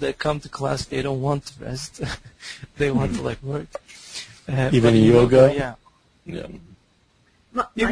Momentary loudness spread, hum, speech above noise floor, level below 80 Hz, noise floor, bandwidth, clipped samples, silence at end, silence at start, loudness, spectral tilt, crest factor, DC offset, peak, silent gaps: 21 LU; none; 40 dB; -42 dBFS; -61 dBFS; 11 kHz; under 0.1%; 0 s; 0 s; -21 LUFS; -6.5 dB/octave; 20 dB; under 0.1%; -2 dBFS; none